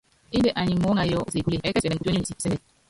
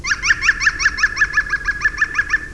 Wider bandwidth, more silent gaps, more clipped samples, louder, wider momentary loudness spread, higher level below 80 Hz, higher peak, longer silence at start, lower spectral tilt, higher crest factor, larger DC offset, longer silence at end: about the same, 11.5 kHz vs 11 kHz; neither; neither; second, -25 LUFS vs -16 LUFS; about the same, 6 LU vs 4 LU; second, -46 dBFS vs -34 dBFS; second, -10 dBFS vs -2 dBFS; first, 0.3 s vs 0 s; first, -5.5 dB/octave vs -0.5 dB/octave; about the same, 14 dB vs 16 dB; second, under 0.1% vs 0.6%; first, 0.3 s vs 0 s